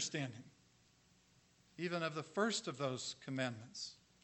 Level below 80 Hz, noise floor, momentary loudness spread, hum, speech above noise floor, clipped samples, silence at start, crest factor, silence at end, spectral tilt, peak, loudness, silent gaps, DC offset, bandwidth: -82 dBFS; -71 dBFS; 11 LU; 60 Hz at -70 dBFS; 29 dB; under 0.1%; 0 s; 22 dB; 0.3 s; -3.5 dB/octave; -22 dBFS; -42 LUFS; none; under 0.1%; 8.6 kHz